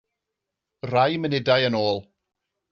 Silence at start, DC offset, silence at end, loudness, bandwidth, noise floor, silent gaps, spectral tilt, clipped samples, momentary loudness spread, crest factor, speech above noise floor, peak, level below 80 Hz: 0.85 s; under 0.1%; 0.7 s; -22 LUFS; 7 kHz; -84 dBFS; none; -3.5 dB/octave; under 0.1%; 9 LU; 20 dB; 62 dB; -6 dBFS; -64 dBFS